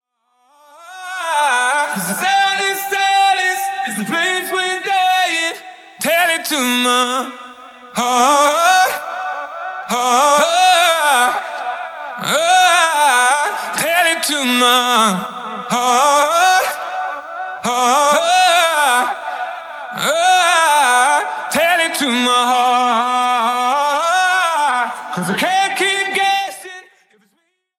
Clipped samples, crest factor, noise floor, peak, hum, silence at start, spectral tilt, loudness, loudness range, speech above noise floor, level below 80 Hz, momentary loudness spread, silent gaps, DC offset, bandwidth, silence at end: under 0.1%; 16 dB; -66 dBFS; 0 dBFS; none; 0.8 s; -1.5 dB/octave; -14 LUFS; 3 LU; 51 dB; -68 dBFS; 13 LU; none; under 0.1%; 17 kHz; 1 s